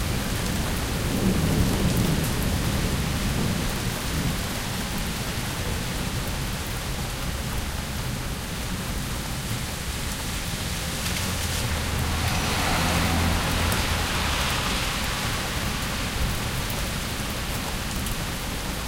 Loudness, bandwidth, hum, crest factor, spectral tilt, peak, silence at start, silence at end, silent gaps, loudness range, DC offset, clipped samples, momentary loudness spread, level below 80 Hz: -26 LUFS; 17 kHz; none; 16 dB; -4 dB/octave; -10 dBFS; 0 s; 0 s; none; 6 LU; under 0.1%; under 0.1%; 6 LU; -32 dBFS